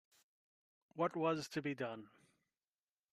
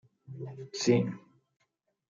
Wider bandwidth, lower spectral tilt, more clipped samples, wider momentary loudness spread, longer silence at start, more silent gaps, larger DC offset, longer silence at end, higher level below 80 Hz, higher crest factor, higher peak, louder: first, 13.5 kHz vs 9 kHz; about the same, -5.5 dB/octave vs -5.5 dB/octave; neither; second, 14 LU vs 21 LU; first, 0.95 s vs 0.3 s; neither; neither; about the same, 1.05 s vs 0.95 s; second, -86 dBFS vs -76 dBFS; about the same, 20 dB vs 22 dB; second, -24 dBFS vs -12 dBFS; second, -40 LUFS vs -30 LUFS